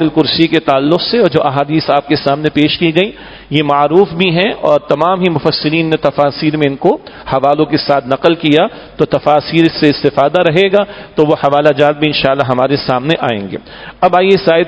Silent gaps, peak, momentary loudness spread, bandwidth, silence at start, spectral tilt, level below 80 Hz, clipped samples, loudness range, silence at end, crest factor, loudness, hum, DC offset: none; 0 dBFS; 5 LU; 8 kHz; 0 s; -7.5 dB/octave; -44 dBFS; 0.5%; 2 LU; 0 s; 12 dB; -12 LUFS; none; under 0.1%